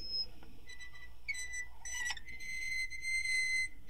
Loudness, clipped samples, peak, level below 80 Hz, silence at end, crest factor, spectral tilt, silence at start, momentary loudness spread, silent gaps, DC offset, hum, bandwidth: -37 LUFS; under 0.1%; -24 dBFS; -56 dBFS; 0 s; 14 dB; 1 dB/octave; 0 s; 19 LU; none; 0.7%; none; 16 kHz